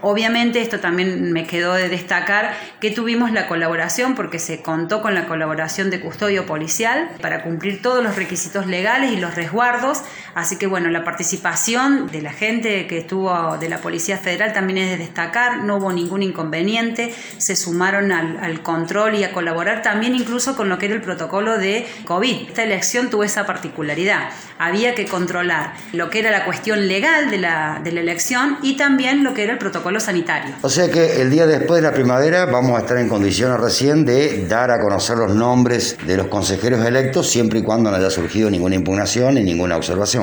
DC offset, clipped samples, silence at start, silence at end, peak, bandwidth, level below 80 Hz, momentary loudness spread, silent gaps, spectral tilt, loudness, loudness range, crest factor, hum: under 0.1%; under 0.1%; 0 s; 0 s; -2 dBFS; over 20 kHz; -52 dBFS; 7 LU; none; -4 dB/octave; -18 LUFS; 4 LU; 16 dB; none